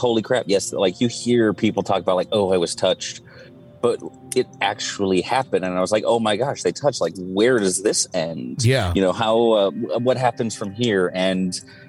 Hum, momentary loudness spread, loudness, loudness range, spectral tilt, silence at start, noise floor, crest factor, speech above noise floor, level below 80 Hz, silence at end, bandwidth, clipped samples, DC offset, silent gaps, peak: none; 6 LU; -21 LUFS; 3 LU; -4.5 dB/octave; 0 s; -44 dBFS; 14 dB; 23 dB; -52 dBFS; 0.05 s; 13.5 kHz; under 0.1%; under 0.1%; none; -6 dBFS